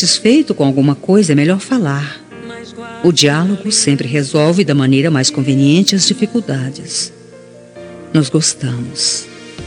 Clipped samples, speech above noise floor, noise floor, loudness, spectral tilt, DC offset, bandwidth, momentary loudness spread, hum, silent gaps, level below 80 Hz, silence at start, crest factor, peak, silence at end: under 0.1%; 25 dB; -37 dBFS; -13 LUFS; -4.5 dB/octave; under 0.1%; 12.5 kHz; 16 LU; none; none; -56 dBFS; 0 s; 14 dB; 0 dBFS; 0 s